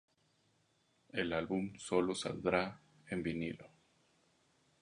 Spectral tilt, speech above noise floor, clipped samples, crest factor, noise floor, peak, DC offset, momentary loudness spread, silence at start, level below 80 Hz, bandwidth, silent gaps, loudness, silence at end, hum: -5 dB/octave; 38 dB; under 0.1%; 24 dB; -76 dBFS; -16 dBFS; under 0.1%; 9 LU; 1.15 s; -66 dBFS; 10.5 kHz; none; -38 LUFS; 1.15 s; none